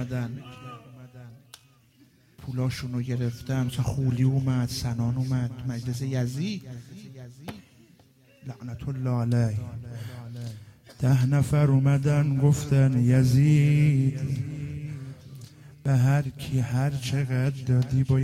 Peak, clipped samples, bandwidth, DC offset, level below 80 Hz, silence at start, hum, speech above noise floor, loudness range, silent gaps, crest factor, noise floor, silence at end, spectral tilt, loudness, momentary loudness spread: -10 dBFS; under 0.1%; 14 kHz; under 0.1%; -52 dBFS; 0 s; none; 35 dB; 12 LU; none; 14 dB; -59 dBFS; 0 s; -7.5 dB/octave; -25 LUFS; 21 LU